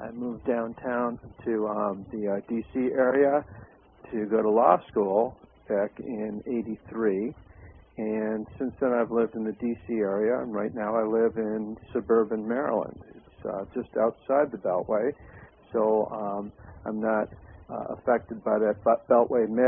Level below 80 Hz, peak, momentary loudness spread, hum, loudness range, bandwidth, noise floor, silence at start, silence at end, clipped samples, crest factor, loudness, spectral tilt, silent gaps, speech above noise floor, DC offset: -58 dBFS; -4 dBFS; 13 LU; none; 4 LU; 3.6 kHz; -50 dBFS; 0 s; 0 s; under 0.1%; 22 dB; -27 LUFS; -11.5 dB/octave; none; 23 dB; under 0.1%